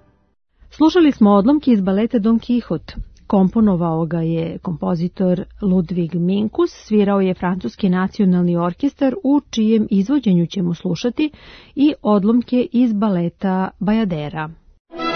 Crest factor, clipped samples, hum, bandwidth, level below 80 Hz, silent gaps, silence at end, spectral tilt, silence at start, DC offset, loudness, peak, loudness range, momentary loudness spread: 14 dB; under 0.1%; none; 6.4 kHz; -44 dBFS; 14.80-14.85 s; 0 s; -8 dB/octave; 0.8 s; under 0.1%; -18 LUFS; -2 dBFS; 3 LU; 8 LU